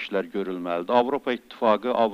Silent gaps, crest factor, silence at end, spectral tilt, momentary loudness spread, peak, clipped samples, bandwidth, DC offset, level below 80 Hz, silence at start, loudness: none; 18 dB; 0 s; -6.5 dB/octave; 8 LU; -6 dBFS; under 0.1%; 15.5 kHz; under 0.1%; -70 dBFS; 0 s; -25 LUFS